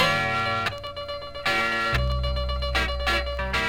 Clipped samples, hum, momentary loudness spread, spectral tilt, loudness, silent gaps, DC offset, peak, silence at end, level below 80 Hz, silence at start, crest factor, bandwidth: under 0.1%; none; 10 LU; -4 dB/octave; -25 LUFS; none; under 0.1%; -10 dBFS; 0 s; -32 dBFS; 0 s; 16 dB; 16.5 kHz